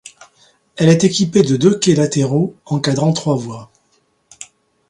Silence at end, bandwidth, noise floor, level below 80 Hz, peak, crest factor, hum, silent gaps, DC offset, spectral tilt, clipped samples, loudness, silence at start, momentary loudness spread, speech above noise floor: 0.45 s; 11 kHz; -61 dBFS; -54 dBFS; 0 dBFS; 16 dB; none; none; under 0.1%; -5.5 dB/octave; under 0.1%; -15 LUFS; 0.75 s; 24 LU; 47 dB